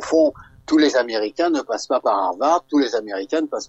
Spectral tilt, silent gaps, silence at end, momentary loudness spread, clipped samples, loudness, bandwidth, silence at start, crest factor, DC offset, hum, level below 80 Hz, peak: -3 dB/octave; none; 0 s; 6 LU; under 0.1%; -20 LUFS; 8.2 kHz; 0 s; 16 dB; under 0.1%; none; -58 dBFS; -4 dBFS